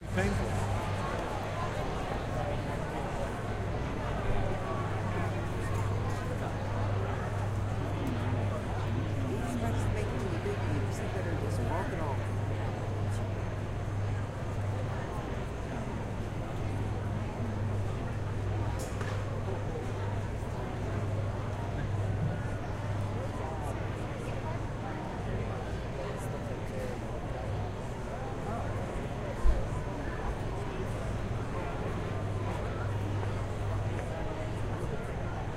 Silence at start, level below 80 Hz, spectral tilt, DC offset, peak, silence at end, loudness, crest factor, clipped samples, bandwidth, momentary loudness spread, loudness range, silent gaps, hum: 0 s; -40 dBFS; -7 dB/octave; under 0.1%; -14 dBFS; 0 s; -35 LUFS; 20 dB; under 0.1%; 12.5 kHz; 4 LU; 3 LU; none; none